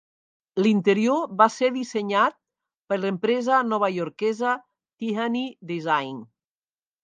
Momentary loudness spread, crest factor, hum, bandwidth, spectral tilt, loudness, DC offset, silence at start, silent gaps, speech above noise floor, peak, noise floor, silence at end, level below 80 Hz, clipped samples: 11 LU; 22 dB; none; 9.4 kHz; -5.5 dB/octave; -24 LUFS; under 0.1%; 0.55 s; 2.81-2.85 s; over 67 dB; -2 dBFS; under -90 dBFS; 0.8 s; -78 dBFS; under 0.1%